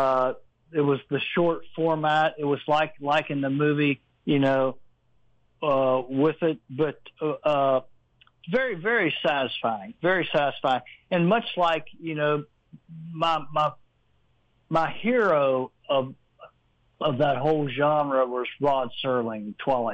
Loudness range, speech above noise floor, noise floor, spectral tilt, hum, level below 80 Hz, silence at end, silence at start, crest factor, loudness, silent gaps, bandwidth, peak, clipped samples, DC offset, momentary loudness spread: 2 LU; 43 dB; -67 dBFS; -7.5 dB/octave; none; -64 dBFS; 0 s; 0 s; 14 dB; -25 LUFS; none; 8.2 kHz; -12 dBFS; under 0.1%; under 0.1%; 7 LU